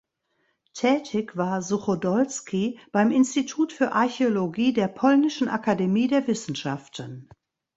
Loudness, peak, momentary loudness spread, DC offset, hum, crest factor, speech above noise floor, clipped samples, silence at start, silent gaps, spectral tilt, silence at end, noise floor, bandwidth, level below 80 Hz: -24 LUFS; -6 dBFS; 10 LU; under 0.1%; none; 18 dB; 48 dB; under 0.1%; 0.75 s; none; -5.5 dB/octave; 0.55 s; -72 dBFS; 8 kHz; -66 dBFS